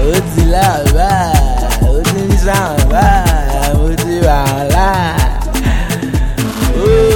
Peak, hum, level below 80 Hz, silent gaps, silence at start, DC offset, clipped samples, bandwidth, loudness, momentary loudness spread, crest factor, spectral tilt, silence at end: 0 dBFS; none; -14 dBFS; none; 0 s; under 0.1%; under 0.1%; 18.5 kHz; -12 LUFS; 5 LU; 10 dB; -5.5 dB/octave; 0 s